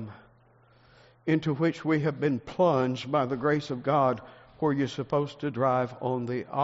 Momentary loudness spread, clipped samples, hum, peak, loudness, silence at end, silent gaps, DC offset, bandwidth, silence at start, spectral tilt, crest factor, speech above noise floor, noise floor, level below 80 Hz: 6 LU; under 0.1%; none; -12 dBFS; -28 LUFS; 0 s; none; under 0.1%; 7.6 kHz; 0 s; -6 dB/octave; 16 dB; 33 dB; -60 dBFS; -64 dBFS